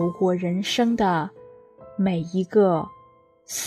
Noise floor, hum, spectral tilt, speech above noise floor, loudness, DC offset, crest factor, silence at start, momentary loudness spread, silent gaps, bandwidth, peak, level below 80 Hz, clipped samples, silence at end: -55 dBFS; none; -5.5 dB/octave; 33 dB; -23 LUFS; under 0.1%; 16 dB; 0 s; 13 LU; none; 14 kHz; -8 dBFS; -60 dBFS; under 0.1%; 0 s